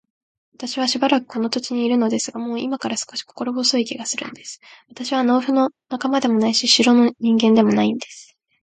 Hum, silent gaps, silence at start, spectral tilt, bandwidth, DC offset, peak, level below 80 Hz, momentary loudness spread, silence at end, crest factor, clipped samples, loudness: none; none; 0.6 s; -3.5 dB/octave; 9.4 kHz; under 0.1%; 0 dBFS; -66 dBFS; 14 LU; 0.4 s; 20 dB; under 0.1%; -19 LUFS